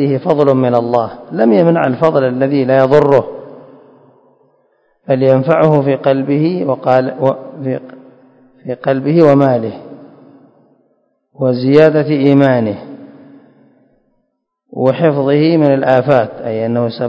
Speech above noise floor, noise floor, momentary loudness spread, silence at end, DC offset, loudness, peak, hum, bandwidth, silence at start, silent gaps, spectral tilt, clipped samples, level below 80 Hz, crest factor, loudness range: 56 dB; -67 dBFS; 12 LU; 0 s; under 0.1%; -12 LUFS; 0 dBFS; none; 8 kHz; 0 s; none; -9.5 dB/octave; 0.5%; -56 dBFS; 14 dB; 4 LU